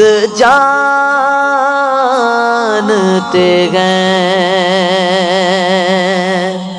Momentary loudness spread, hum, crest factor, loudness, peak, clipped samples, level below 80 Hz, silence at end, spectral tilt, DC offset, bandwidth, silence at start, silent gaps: 3 LU; none; 10 dB; -10 LUFS; 0 dBFS; 0.3%; -54 dBFS; 0 s; -4.5 dB/octave; under 0.1%; 10.5 kHz; 0 s; none